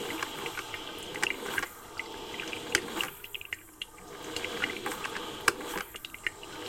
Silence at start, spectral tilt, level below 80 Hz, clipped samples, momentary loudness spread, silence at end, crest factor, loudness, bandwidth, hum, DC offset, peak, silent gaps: 0 s; -1.5 dB/octave; -60 dBFS; under 0.1%; 11 LU; 0 s; 32 dB; -35 LUFS; 17 kHz; none; under 0.1%; -4 dBFS; none